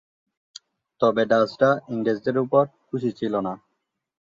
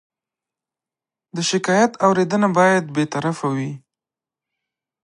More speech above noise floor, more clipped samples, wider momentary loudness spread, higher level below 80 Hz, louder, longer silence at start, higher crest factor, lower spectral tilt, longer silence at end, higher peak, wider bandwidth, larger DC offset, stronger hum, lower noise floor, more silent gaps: second, 55 dB vs 71 dB; neither; second, 9 LU vs 12 LU; about the same, -66 dBFS vs -70 dBFS; second, -23 LUFS vs -19 LUFS; second, 1 s vs 1.35 s; about the same, 18 dB vs 18 dB; first, -7 dB/octave vs -5 dB/octave; second, 0.8 s vs 1.3 s; second, -6 dBFS vs -2 dBFS; second, 7.2 kHz vs 11 kHz; neither; neither; second, -77 dBFS vs -89 dBFS; neither